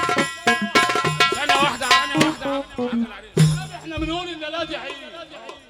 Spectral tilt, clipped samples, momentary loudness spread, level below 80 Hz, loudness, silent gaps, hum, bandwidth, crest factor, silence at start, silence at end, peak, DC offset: -4 dB/octave; under 0.1%; 14 LU; -46 dBFS; -20 LUFS; none; none; 16.5 kHz; 20 dB; 0 s; 0.1 s; -2 dBFS; under 0.1%